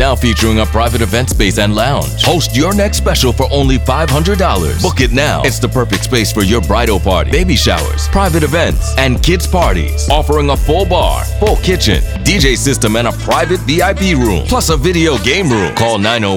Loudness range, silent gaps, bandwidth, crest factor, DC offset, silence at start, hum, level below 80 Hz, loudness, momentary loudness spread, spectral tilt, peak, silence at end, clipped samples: 1 LU; none; 18 kHz; 12 dB; under 0.1%; 0 s; none; -18 dBFS; -12 LUFS; 2 LU; -4.5 dB/octave; 0 dBFS; 0 s; under 0.1%